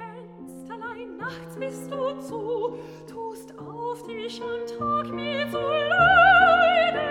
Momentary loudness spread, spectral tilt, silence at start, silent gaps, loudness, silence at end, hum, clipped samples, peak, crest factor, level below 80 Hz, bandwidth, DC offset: 24 LU; -4.5 dB/octave; 0 s; none; -22 LUFS; 0 s; none; under 0.1%; -6 dBFS; 18 dB; -52 dBFS; 15.5 kHz; under 0.1%